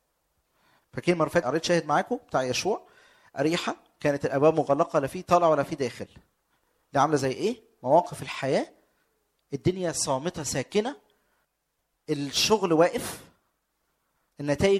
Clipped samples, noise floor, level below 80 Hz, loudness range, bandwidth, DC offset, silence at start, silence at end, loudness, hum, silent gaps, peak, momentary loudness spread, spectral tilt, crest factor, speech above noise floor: under 0.1%; -78 dBFS; -58 dBFS; 4 LU; 15.5 kHz; under 0.1%; 0.95 s; 0 s; -26 LUFS; none; none; -8 dBFS; 12 LU; -4.5 dB/octave; 20 dB; 52 dB